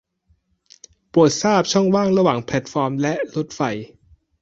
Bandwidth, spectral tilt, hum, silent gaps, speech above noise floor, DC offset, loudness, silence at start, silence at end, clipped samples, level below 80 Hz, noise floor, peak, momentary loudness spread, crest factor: 8 kHz; -5.5 dB/octave; none; none; 45 dB; under 0.1%; -19 LUFS; 1.15 s; 0.55 s; under 0.1%; -56 dBFS; -63 dBFS; -2 dBFS; 9 LU; 18 dB